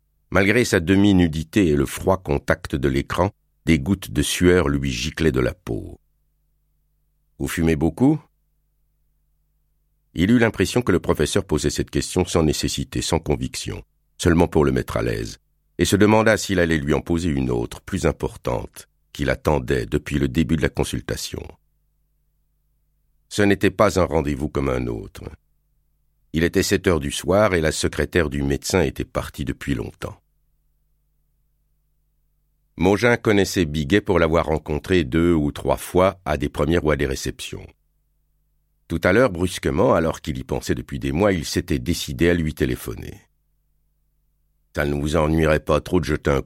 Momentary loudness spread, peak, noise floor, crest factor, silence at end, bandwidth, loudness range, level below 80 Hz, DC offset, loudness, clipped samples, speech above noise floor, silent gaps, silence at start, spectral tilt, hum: 12 LU; -2 dBFS; -66 dBFS; 18 dB; 0 s; 16.5 kHz; 6 LU; -36 dBFS; under 0.1%; -21 LUFS; under 0.1%; 46 dB; none; 0.3 s; -5.5 dB/octave; 50 Hz at -50 dBFS